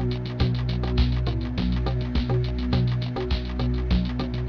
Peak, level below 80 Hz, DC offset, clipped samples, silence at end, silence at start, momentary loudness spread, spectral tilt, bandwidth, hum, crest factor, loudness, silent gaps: -10 dBFS; -28 dBFS; under 0.1%; under 0.1%; 0 s; 0 s; 3 LU; -8.5 dB/octave; 6.2 kHz; none; 14 dB; -26 LUFS; none